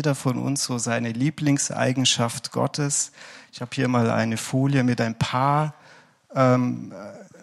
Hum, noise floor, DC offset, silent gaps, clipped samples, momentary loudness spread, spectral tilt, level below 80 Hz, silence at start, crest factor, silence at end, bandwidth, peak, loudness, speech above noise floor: none; -52 dBFS; under 0.1%; none; under 0.1%; 12 LU; -4.5 dB/octave; -62 dBFS; 0 s; 18 dB; 0.15 s; 13.5 kHz; -6 dBFS; -23 LUFS; 29 dB